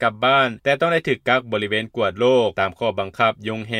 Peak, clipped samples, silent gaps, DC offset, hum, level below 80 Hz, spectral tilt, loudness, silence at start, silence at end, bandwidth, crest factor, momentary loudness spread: -4 dBFS; under 0.1%; none; under 0.1%; none; -58 dBFS; -5.5 dB/octave; -20 LUFS; 0 s; 0 s; 12.5 kHz; 16 dB; 7 LU